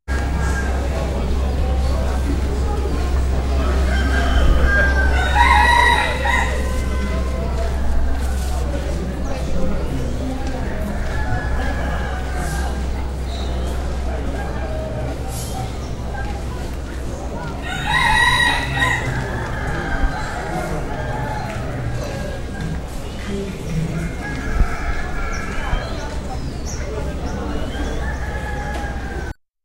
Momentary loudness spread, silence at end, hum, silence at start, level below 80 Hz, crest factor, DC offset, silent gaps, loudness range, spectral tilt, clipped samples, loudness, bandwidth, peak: 11 LU; 0.35 s; none; 0.05 s; -22 dBFS; 18 dB; under 0.1%; none; 10 LU; -5 dB/octave; under 0.1%; -21 LUFS; 13.5 kHz; -2 dBFS